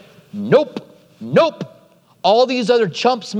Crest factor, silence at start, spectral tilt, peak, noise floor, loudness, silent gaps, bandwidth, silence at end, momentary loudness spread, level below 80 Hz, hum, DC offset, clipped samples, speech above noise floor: 18 dB; 0.35 s; -5.5 dB/octave; 0 dBFS; -51 dBFS; -16 LUFS; none; 9.6 kHz; 0 s; 19 LU; -70 dBFS; none; under 0.1%; under 0.1%; 35 dB